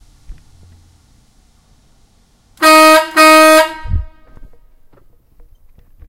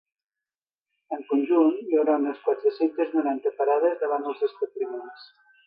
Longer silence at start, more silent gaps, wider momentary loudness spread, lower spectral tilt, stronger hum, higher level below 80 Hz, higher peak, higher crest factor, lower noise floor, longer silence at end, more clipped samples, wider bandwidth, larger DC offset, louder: second, 0.3 s vs 1.1 s; neither; first, 18 LU vs 11 LU; second, -3 dB/octave vs -7.5 dB/octave; neither; first, -32 dBFS vs -86 dBFS; first, 0 dBFS vs -8 dBFS; about the same, 14 dB vs 16 dB; second, -51 dBFS vs under -90 dBFS; first, 2 s vs 0.4 s; first, 0.6% vs under 0.1%; first, 19 kHz vs 5.2 kHz; neither; first, -7 LUFS vs -25 LUFS